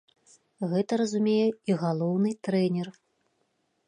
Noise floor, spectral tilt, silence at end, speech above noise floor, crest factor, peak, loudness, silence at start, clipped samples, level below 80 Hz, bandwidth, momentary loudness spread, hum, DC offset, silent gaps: -74 dBFS; -7 dB/octave; 0.95 s; 48 dB; 14 dB; -14 dBFS; -27 LUFS; 0.6 s; under 0.1%; -78 dBFS; 10.5 kHz; 7 LU; none; under 0.1%; none